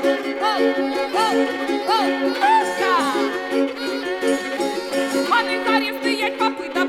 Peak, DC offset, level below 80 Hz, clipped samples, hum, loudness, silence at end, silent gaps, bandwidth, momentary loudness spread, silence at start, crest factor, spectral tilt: -6 dBFS; under 0.1%; -64 dBFS; under 0.1%; none; -20 LUFS; 0 s; none; 17 kHz; 5 LU; 0 s; 14 dB; -2.5 dB/octave